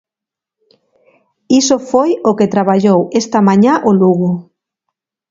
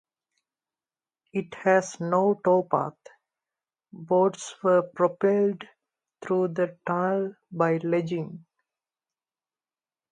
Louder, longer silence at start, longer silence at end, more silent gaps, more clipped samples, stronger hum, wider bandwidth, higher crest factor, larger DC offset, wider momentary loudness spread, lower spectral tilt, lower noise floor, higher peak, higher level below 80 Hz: first, -12 LUFS vs -25 LUFS; first, 1.5 s vs 1.35 s; second, 0.9 s vs 1.7 s; neither; neither; neither; second, 7.6 kHz vs 9.8 kHz; about the same, 14 dB vs 18 dB; neither; second, 5 LU vs 11 LU; about the same, -6 dB/octave vs -6.5 dB/octave; second, -86 dBFS vs under -90 dBFS; first, 0 dBFS vs -8 dBFS; first, -58 dBFS vs -76 dBFS